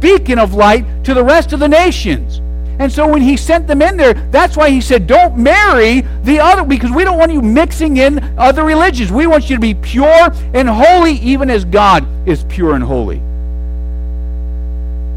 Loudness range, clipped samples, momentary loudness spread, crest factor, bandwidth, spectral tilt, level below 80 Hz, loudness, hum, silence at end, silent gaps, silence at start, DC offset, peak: 3 LU; under 0.1%; 14 LU; 10 dB; 14.5 kHz; -6 dB/octave; -18 dBFS; -10 LUFS; none; 0 s; none; 0 s; under 0.1%; 0 dBFS